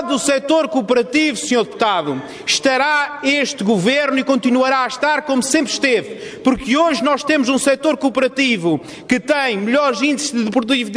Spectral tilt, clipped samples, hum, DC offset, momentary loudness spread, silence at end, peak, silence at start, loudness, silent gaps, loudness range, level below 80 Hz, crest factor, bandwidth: -3.5 dB/octave; under 0.1%; none; under 0.1%; 4 LU; 0 s; -2 dBFS; 0 s; -16 LUFS; none; 1 LU; -52 dBFS; 14 dB; 11 kHz